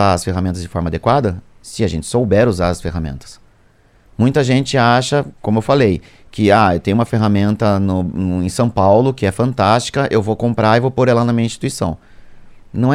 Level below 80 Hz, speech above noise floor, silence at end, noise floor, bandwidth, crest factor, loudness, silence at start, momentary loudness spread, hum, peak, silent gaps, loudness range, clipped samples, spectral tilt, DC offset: -38 dBFS; 36 dB; 0 s; -51 dBFS; 14 kHz; 16 dB; -15 LUFS; 0 s; 10 LU; none; 0 dBFS; none; 3 LU; under 0.1%; -6.5 dB/octave; under 0.1%